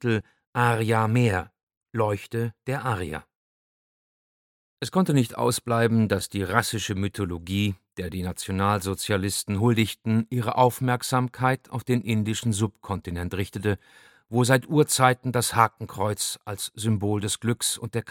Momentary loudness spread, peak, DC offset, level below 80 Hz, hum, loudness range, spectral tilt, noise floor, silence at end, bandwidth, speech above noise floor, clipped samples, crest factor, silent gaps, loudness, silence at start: 10 LU; -2 dBFS; under 0.1%; -54 dBFS; none; 5 LU; -5 dB/octave; under -90 dBFS; 0 s; 17.5 kHz; over 65 dB; under 0.1%; 24 dB; 0.47-0.53 s, 1.63-1.67 s, 1.77-1.81 s, 3.35-4.77 s; -25 LUFS; 0 s